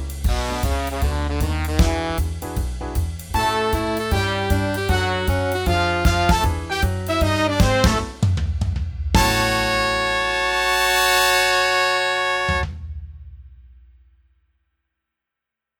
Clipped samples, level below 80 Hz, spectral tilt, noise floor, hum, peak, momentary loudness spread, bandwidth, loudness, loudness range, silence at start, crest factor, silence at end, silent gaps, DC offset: under 0.1%; -28 dBFS; -4.5 dB/octave; -85 dBFS; none; -2 dBFS; 10 LU; over 20 kHz; -20 LUFS; 6 LU; 0 s; 20 dB; 2.1 s; none; under 0.1%